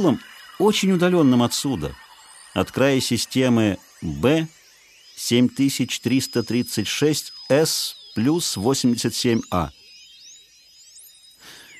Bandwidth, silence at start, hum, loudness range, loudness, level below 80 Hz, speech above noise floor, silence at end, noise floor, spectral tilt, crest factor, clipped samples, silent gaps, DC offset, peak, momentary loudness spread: 14 kHz; 0 s; none; 3 LU; -21 LUFS; -50 dBFS; 31 dB; 0 s; -52 dBFS; -4.5 dB/octave; 18 dB; under 0.1%; none; under 0.1%; -4 dBFS; 10 LU